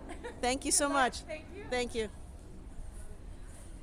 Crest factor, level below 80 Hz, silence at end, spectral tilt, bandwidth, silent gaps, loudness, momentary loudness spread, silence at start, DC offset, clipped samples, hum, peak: 22 dB; -48 dBFS; 0 s; -2.5 dB/octave; over 20 kHz; none; -32 LUFS; 23 LU; 0 s; under 0.1%; under 0.1%; none; -14 dBFS